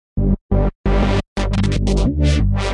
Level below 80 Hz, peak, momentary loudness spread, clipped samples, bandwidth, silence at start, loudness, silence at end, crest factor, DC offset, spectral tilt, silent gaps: -20 dBFS; -4 dBFS; 4 LU; under 0.1%; 10.5 kHz; 0.15 s; -18 LUFS; 0 s; 12 dB; under 0.1%; -7 dB/octave; 0.41-0.49 s, 0.75-0.84 s, 1.28-1.36 s